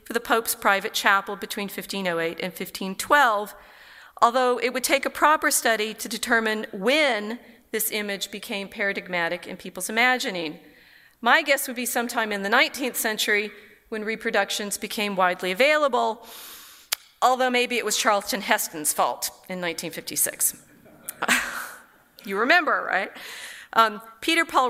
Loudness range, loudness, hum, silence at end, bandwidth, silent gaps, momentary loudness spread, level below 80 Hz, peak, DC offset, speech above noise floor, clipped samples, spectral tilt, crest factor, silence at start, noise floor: 4 LU; -23 LUFS; none; 0 s; 16 kHz; none; 13 LU; -64 dBFS; -2 dBFS; under 0.1%; 30 dB; under 0.1%; -1.5 dB/octave; 24 dB; 0.1 s; -54 dBFS